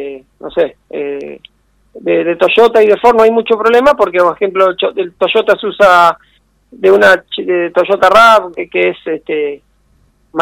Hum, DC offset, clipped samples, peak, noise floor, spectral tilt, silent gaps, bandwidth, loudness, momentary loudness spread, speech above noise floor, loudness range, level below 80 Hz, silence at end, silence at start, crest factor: none; under 0.1%; 2%; 0 dBFS; -53 dBFS; -4.5 dB/octave; none; 17 kHz; -10 LUFS; 15 LU; 42 dB; 2 LU; -48 dBFS; 0 s; 0 s; 12 dB